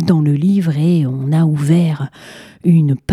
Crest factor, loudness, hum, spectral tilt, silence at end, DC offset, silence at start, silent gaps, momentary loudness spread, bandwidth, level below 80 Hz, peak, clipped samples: 14 dB; -14 LUFS; none; -8.5 dB/octave; 0 s; under 0.1%; 0 s; none; 6 LU; 12 kHz; -52 dBFS; 0 dBFS; under 0.1%